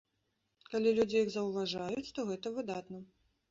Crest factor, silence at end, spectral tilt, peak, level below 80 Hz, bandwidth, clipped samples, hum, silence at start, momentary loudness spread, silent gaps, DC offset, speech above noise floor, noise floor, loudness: 18 dB; 0.45 s; -5.5 dB/octave; -18 dBFS; -72 dBFS; 7.8 kHz; under 0.1%; none; 0.7 s; 12 LU; none; under 0.1%; 47 dB; -81 dBFS; -35 LUFS